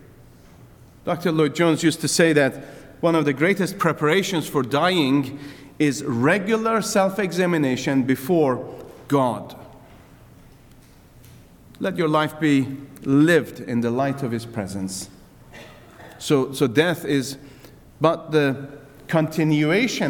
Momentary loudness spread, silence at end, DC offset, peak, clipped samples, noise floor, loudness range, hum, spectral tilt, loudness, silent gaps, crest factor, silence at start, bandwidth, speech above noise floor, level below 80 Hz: 14 LU; 0 s; under 0.1%; -2 dBFS; under 0.1%; -49 dBFS; 6 LU; none; -5.5 dB/octave; -21 LUFS; none; 20 dB; 1.05 s; 19 kHz; 28 dB; -56 dBFS